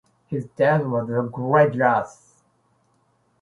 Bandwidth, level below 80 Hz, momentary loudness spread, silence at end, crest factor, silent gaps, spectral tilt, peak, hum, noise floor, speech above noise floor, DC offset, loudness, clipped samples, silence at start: 11 kHz; -64 dBFS; 13 LU; 1.3 s; 20 dB; none; -8 dB/octave; -4 dBFS; none; -65 dBFS; 44 dB; under 0.1%; -21 LUFS; under 0.1%; 0.3 s